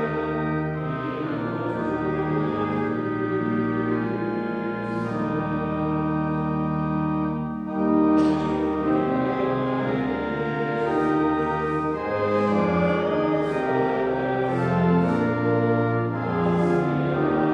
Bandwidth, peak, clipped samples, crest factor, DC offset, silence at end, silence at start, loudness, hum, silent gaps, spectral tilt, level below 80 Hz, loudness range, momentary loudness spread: 8.4 kHz; -8 dBFS; under 0.1%; 14 dB; under 0.1%; 0 s; 0 s; -24 LUFS; none; none; -9 dB/octave; -48 dBFS; 3 LU; 6 LU